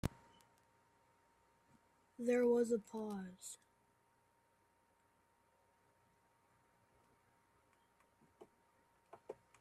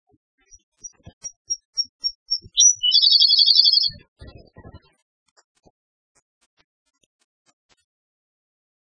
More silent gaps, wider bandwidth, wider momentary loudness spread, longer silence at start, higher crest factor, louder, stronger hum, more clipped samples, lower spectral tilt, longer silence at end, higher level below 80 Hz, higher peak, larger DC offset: second, none vs 1.13-1.21 s, 1.36-1.45 s, 1.65-1.73 s, 1.89-2.00 s, 2.15-2.26 s, 4.08-4.16 s; first, 13.5 kHz vs 9.8 kHz; first, 23 LU vs 18 LU; second, 0.05 s vs 0.85 s; about the same, 26 dB vs 22 dB; second, -39 LUFS vs -15 LUFS; neither; neither; first, -6 dB/octave vs 2.5 dB/octave; second, 0.25 s vs 4.2 s; second, -70 dBFS vs -58 dBFS; second, -20 dBFS vs 0 dBFS; neither